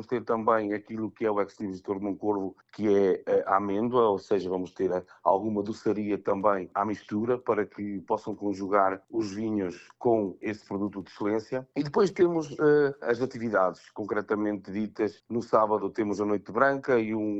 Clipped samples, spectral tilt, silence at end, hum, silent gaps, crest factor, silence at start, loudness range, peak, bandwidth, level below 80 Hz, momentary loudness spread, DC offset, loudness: under 0.1%; -7 dB/octave; 0 s; none; none; 20 dB; 0 s; 3 LU; -6 dBFS; 8 kHz; -66 dBFS; 9 LU; under 0.1%; -28 LUFS